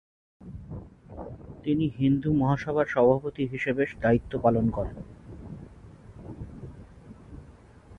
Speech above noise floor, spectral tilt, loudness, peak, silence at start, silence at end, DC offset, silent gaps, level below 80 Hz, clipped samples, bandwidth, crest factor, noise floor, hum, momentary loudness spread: 26 dB; -9 dB/octave; -26 LUFS; -8 dBFS; 0.4 s; 0 s; under 0.1%; none; -48 dBFS; under 0.1%; 7.2 kHz; 20 dB; -51 dBFS; none; 23 LU